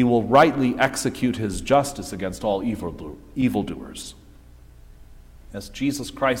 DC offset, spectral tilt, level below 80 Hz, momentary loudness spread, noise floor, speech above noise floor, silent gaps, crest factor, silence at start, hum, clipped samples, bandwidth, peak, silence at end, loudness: under 0.1%; -5 dB/octave; -44 dBFS; 19 LU; -47 dBFS; 25 dB; none; 20 dB; 0 s; none; under 0.1%; 16.5 kHz; -2 dBFS; 0 s; -22 LUFS